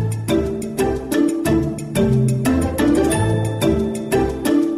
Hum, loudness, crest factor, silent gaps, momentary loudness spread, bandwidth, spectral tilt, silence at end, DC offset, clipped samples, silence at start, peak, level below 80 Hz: none; -19 LUFS; 10 dB; none; 4 LU; 16 kHz; -6.5 dB/octave; 0 s; under 0.1%; under 0.1%; 0 s; -8 dBFS; -34 dBFS